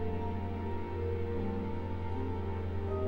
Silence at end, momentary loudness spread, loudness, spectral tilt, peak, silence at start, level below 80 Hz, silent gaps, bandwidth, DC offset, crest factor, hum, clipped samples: 0 s; 2 LU; -37 LUFS; -9.5 dB/octave; -22 dBFS; 0 s; -46 dBFS; none; 5.2 kHz; under 0.1%; 12 dB; none; under 0.1%